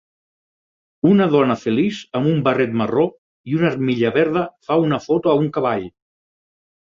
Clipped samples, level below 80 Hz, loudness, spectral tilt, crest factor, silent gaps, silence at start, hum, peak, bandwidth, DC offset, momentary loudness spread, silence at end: under 0.1%; -56 dBFS; -18 LUFS; -8 dB/octave; 16 dB; 3.18-3.44 s; 1.05 s; none; -2 dBFS; 7.4 kHz; under 0.1%; 6 LU; 0.95 s